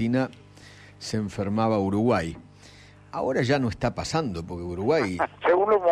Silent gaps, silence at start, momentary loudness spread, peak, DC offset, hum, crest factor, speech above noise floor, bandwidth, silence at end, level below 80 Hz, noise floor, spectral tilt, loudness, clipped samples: none; 0 s; 11 LU; -12 dBFS; under 0.1%; 50 Hz at -50 dBFS; 14 dB; 25 dB; 12.5 kHz; 0 s; -50 dBFS; -50 dBFS; -6.5 dB/octave; -26 LUFS; under 0.1%